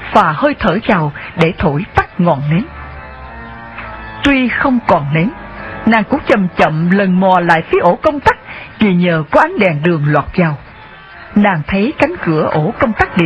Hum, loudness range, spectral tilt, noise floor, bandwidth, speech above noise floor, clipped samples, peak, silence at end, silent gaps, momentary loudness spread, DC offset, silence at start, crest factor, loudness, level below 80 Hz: none; 4 LU; -8 dB/octave; -35 dBFS; 8.4 kHz; 23 dB; 0.3%; 0 dBFS; 0 s; none; 16 LU; under 0.1%; 0 s; 14 dB; -13 LUFS; -36 dBFS